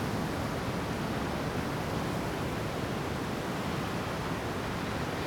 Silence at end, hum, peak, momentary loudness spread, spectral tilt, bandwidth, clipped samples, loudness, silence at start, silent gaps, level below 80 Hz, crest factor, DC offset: 0 s; none; -20 dBFS; 1 LU; -5.5 dB/octave; over 20 kHz; under 0.1%; -34 LUFS; 0 s; none; -48 dBFS; 12 dB; under 0.1%